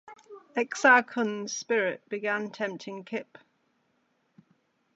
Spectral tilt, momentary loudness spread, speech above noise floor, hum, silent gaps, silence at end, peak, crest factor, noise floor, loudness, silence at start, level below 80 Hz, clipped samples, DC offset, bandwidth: -3 dB/octave; 16 LU; 45 dB; none; none; 1.75 s; -6 dBFS; 24 dB; -72 dBFS; -27 LUFS; 0.1 s; -88 dBFS; under 0.1%; under 0.1%; 8.2 kHz